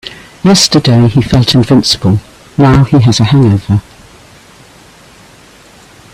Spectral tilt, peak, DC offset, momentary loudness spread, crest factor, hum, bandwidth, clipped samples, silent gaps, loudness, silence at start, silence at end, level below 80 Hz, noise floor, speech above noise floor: -5.5 dB/octave; 0 dBFS; under 0.1%; 9 LU; 10 dB; none; 14.5 kHz; under 0.1%; none; -8 LUFS; 0.05 s; 2.35 s; -34 dBFS; -38 dBFS; 31 dB